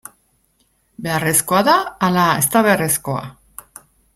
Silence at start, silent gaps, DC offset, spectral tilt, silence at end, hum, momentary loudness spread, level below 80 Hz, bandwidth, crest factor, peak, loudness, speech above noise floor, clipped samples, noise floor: 1 s; none; under 0.1%; -3.5 dB/octave; 0.85 s; none; 17 LU; -52 dBFS; 16.5 kHz; 18 dB; 0 dBFS; -16 LUFS; 46 dB; under 0.1%; -62 dBFS